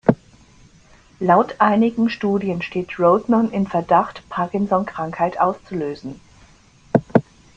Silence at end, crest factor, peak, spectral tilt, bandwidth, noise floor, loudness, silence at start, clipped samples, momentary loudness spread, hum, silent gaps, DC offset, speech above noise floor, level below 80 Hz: 0.35 s; 18 dB; -2 dBFS; -8 dB/octave; 7.6 kHz; -50 dBFS; -20 LUFS; 0.05 s; under 0.1%; 10 LU; none; none; under 0.1%; 31 dB; -54 dBFS